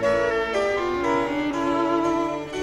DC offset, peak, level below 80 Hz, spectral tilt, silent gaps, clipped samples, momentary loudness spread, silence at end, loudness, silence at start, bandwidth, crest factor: under 0.1%; -10 dBFS; -48 dBFS; -5 dB/octave; none; under 0.1%; 3 LU; 0 s; -23 LUFS; 0 s; 12 kHz; 12 dB